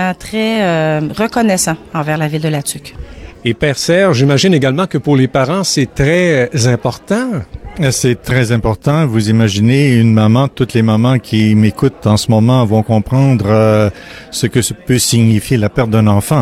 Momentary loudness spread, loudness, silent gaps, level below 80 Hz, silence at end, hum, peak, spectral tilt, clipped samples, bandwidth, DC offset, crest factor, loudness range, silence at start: 7 LU; -12 LUFS; none; -36 dBFS; 0 s; none; -2 dBFS; -5.5 dB/octave; under 0.1%; 15.5 kHz; under 0.1%; 10 dB; 3 LU; 0 s